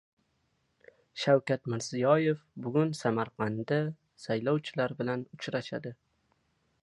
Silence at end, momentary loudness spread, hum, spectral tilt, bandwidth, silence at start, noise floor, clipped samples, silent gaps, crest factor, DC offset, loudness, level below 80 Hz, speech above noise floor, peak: 0.9 s; 11 LU; none; -6 dB/octave; 11.5 kHz; 1.15 s; -75 dBFS; under 0.1%; none; 20 dB; under 0.1%; -31 LUFS; -72 dBFS; 45 dB; -12 dBFS